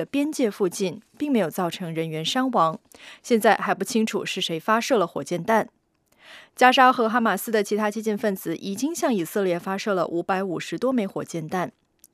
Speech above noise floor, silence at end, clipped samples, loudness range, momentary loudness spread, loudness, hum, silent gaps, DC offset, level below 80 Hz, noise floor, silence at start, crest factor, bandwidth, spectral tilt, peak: 36 dB; 0.45 s; under 0.1%; 4 LU; 10 LU; -23 LUFS; none; none; under 0.1%; -72 dBFS; -60 dBFS; 0 s; 24 dB; 15.5 kHz; -4.5 dB/octave; 0 dBFS